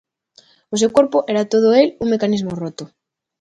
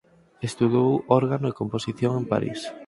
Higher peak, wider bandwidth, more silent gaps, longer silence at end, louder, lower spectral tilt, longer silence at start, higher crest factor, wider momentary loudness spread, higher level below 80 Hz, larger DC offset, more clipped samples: first, 0 dBFS vs -4 dBFS; second, 10 kHz vs 11.5 kHz; neither; first, 0.55 s vs 0.05 s; first, -17 LUFS vs -24 LUFS; second, -5 dB/octave vs -7 dB/octave; first, 0.7 s vs 0.4 s; about the same, 18 dB vs 20 dB; first, 13 LU vs 10 LU; about the same, -56 dBFS vs -58 dBFS; neither; neither